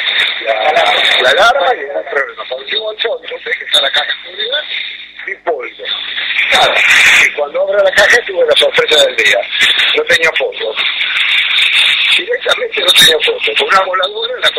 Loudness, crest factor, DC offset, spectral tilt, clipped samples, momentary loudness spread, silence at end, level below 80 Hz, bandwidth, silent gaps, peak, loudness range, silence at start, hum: -10 LUFS; 12 dB; under 0.1%; 0 dB/octave; under 0.1%; 12 LU; 0 s; -50 dBFS; 16 kHz; none; 0 dBFS; 7 LU; 0 s; 50 Hz at -60 dBFS